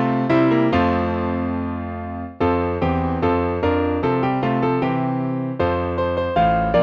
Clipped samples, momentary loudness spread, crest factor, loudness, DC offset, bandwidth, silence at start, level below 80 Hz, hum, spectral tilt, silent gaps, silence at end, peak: under 0.1%; 7 LU; 14 dB; -20 LUFS; under 0.1%; 6.2 kHz; 0 s; -38 dBFS; none; -9 dB/octave; none; 0 s; -6 dBFS